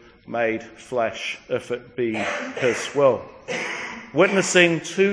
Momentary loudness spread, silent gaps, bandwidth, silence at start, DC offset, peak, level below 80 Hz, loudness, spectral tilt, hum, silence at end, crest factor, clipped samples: 13 LU; none; 10.5 kHz; 0.3 s; under 0.1%; -2 dBFS; -62 dBFS; -22 LUFS; -4 dB/octave; none; 0 s; 22 dB; under 0.1%